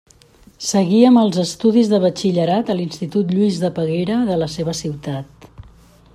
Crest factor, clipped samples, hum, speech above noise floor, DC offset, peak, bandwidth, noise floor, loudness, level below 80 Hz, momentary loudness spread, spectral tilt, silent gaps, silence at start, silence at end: 16 dB; under 0.1%; none; 32 dB; under 0.1%; -2 dBFS; 13 kHz; -48 dBFS; -17 LUFS; -52 dBFS; 13 LU; -6 dB/octave; none; 0.6 s; 0.55 s